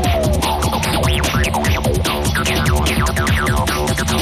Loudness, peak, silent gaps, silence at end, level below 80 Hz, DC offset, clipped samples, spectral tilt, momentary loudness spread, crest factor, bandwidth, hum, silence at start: -17 LUFS; -4 dBFS; none; 0 s; -22 dBFS; under 0.1%; under 0.1%; -4.5 dB/octave; 2 LU; 12 dB; 15.5 kHz; none; 0 s